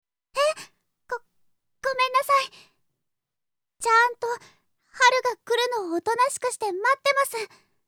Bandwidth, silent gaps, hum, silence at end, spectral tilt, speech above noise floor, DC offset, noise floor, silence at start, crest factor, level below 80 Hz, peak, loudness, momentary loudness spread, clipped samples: 18 kHz; none; none; 0.4 s; -0.5 dB/octave; 63 dB; under 0.1%; -88 dBFS; 0.35 s; 22 dB; -72 dBFS; -4 dBFS; -23 LUFS; 16 LU; under 0.1%